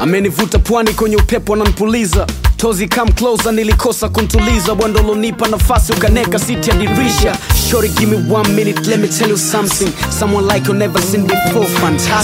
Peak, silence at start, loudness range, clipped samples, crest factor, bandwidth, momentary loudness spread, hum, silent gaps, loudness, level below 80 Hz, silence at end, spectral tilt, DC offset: 0 dBFS; 0 s; 1 LU; under 0.1%; 12 dB; 16.5 kHz; 2 LU; none; none; -13 LUFS; -20 dBFS; 0 s; -4.5 dB/octave; under 0.1%